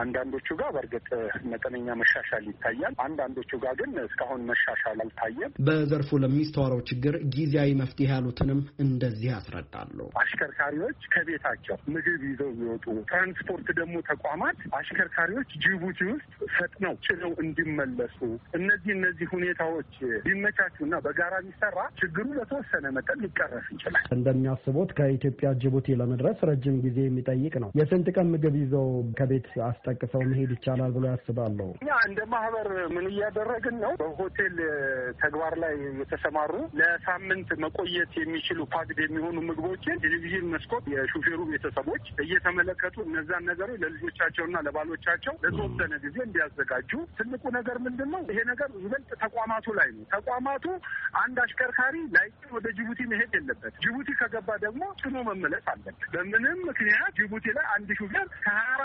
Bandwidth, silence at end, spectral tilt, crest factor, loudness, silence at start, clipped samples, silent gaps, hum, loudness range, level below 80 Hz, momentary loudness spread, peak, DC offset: 5.6 kHz; 0 s; -5 dB/octave; 18 dB; -28 LUFS; 0 s; under 0.1%; none; none; 3 LU; -54 dBFS; 8 LU; -10 dBFS; under 0.1%